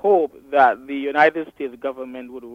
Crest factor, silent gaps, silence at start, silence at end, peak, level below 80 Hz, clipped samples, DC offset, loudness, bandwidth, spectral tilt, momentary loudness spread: 18 dB; none; 0.05 s; 0 s; -2 dBFS; -64 dBFS; under 0.1%; under 0.1%; -20 LUFS; 7 kHz; -6 dB/octave; 16 LU